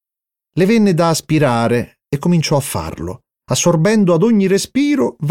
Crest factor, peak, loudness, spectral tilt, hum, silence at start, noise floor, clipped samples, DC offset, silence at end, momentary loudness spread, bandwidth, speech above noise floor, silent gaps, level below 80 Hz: 12 dB; -4 dBFS; -15 LUFS; -5.5 dB/octave; none; 0.55 s; -86 dBFS; under 0.1%; under 0.1%; 0 s; 11 LU; 16.5 kHz; 72 dB; none; -46 dBFS